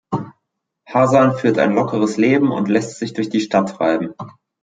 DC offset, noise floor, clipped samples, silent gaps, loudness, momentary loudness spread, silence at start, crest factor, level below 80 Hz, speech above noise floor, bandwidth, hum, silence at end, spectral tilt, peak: under 0.1%; -75 dBFS; under 0.1%; none; -17 LUFS; 13 LU; 0.1 s; 16 dB; -62 dBFS; 59 dB; 9.4 kHz; none; 0.3 s; -6.5 dB/octave; -2 dBFS